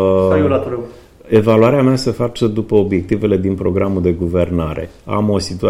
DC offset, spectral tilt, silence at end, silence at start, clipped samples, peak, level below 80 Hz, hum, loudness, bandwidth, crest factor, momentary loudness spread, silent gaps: under 0.1%; -7.5 dB/octave; 0 s; 0 s; under 0.1%; 0 dBFS; -38 dBFS; none; -15 LUFS; 14 kHz; 14 dB; 10 LU; none